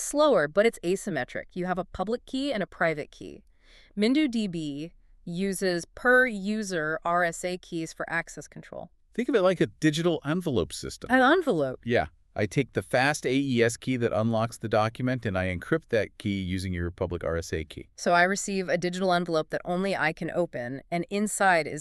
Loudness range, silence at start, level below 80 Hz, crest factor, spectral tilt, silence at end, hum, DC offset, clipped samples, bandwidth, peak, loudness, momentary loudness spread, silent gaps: 4 LU; 0 s; -52 dBFS; 20 dB; -5 dB/octave; 0 s; none; under 0.1%; under 0.1%; 13.5 kHz; -8 dBFS; -27 LUFS; 13 LU; none